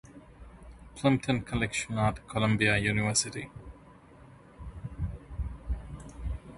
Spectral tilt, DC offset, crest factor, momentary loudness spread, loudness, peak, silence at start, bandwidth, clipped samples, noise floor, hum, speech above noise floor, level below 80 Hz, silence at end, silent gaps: -4.5 dB/octave; under 0.1%; 20 dB; 21 LU; -30 LUFS; -12 dBFS; 0.05 s; 11.5 kHz; under 0.1%; -54 dBFS; none; 25 dB; -44 dBFS; 0 s; none